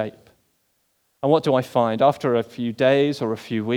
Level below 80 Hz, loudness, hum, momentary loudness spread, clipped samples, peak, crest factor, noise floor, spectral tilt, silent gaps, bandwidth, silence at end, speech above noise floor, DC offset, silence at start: -68 dBFS; -21 LUFS; none; 9 LU; under 0.1%; -4 dBFS; 16 dB; -68 dBFS; -7 dB/octave; none; 18.5 kHz; 0 s; 48 dB; under 0.1%; 0 s